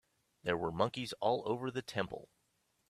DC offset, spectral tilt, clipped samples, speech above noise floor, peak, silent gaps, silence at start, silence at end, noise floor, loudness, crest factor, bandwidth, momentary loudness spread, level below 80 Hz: under 0.1%; -5.5 dB/octave; under 0.1%; 42 dB; -16 dBFS; none; 0.45 s; 0.65 s; -78 dBFS; -37 LUFS; 24 dB; 14 kHz; 8 LU; -70 dBFS